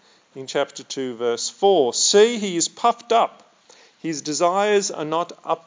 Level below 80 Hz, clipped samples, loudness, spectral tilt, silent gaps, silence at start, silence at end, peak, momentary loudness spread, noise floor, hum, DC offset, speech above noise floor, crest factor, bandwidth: -88 dBFS; under 0.1%; -20 LUFS; -2.5 dB/octave; none; 0.35 s; 0.1 s; -4 dBFS; 12 LU; -52 dBFS; none; under 0.1%; 32 dB; 18 dB; 7.8 kHz